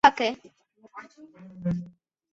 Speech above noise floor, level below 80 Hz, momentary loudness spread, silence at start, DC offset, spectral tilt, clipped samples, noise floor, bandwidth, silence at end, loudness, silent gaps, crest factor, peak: 16 dB; -62 dBFS; 21 LU; 0.05 s; under 0.1%; -5 dB/octave; under 0.1%; -48 dBFS; 7.8 kHz; 0.45 s; -28 LUFS; none; 26 dB; -2 dBFS